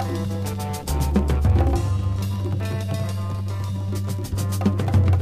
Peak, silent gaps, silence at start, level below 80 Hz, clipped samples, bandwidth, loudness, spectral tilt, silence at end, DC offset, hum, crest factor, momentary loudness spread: -6 dBFS; none; 0 s; -30 dBFS; under 0.1%; 15.5 kHz; -24 LUFS; -7 dB/octave; 0 s; under 0.1%; none; 16 dB; 8 LU